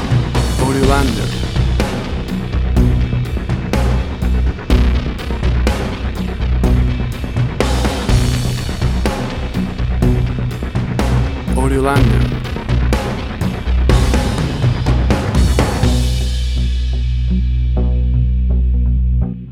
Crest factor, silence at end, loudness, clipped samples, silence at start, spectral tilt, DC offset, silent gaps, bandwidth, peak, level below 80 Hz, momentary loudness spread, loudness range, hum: 14 dB; 0 s; -17 LUFS; under 0.1%; 0 s; -6.5 dB/octave; under 0.1%; none; 13.5 kHz; 0 dBFS; -18 dBFS; 7 LU; 2 LU; none